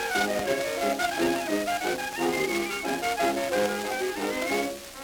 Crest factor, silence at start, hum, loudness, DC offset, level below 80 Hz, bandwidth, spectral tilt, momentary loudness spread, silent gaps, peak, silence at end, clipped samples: 16 dB; 0 s; none; -27 LUFS; under 0.1%; -58 dBFS; over 20 kHz; -3 dB/octave; 3 LU; none; -12 dBFS; 0 s; under 0.1%